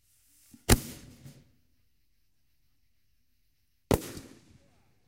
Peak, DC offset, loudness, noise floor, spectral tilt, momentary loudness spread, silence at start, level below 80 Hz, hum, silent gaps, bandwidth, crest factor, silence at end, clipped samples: -6 dBFS; under 0.1%; -29 LUFS; -76 dBFS; -4.5 dB/octave; 24 LU; 0.7 s; -42 dBFS; none; none; 16 kHz; 30 dB; 0.85 s; under 0.1%